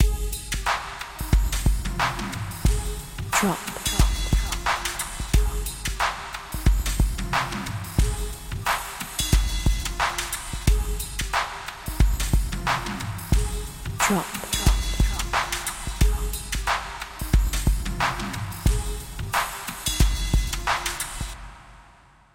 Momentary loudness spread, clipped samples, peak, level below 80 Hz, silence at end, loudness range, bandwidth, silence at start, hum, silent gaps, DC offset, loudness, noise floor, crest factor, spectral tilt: 8 LU; under 0.1%; -6 dBFS; -26 dBFS; 0.5 s; 2 LU; 17 kHz; 0 s; none; none; under 0.1%; -26 LUFS; -53 dBFS; 18 dB; -3.5 dB/octave